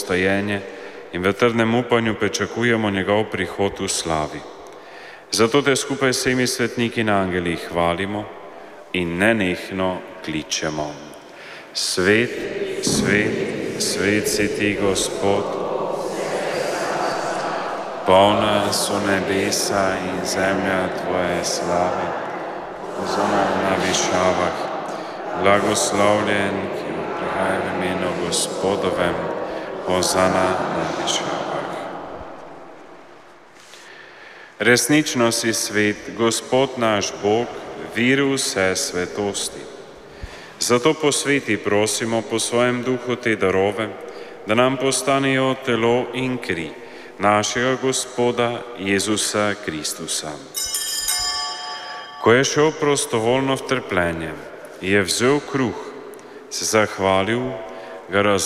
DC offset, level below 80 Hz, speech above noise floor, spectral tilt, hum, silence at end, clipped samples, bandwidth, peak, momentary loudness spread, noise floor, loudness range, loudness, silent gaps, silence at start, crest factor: under 0.1%; -52 dBFS; 26 dB; -3.5 dB/octave; none; 0 s; under 0.1%; 16 kHz; -2 dBFS; 15 LU; -46 dBFS; 3 LU; -20 LUFS; none; 0 s; 18 dB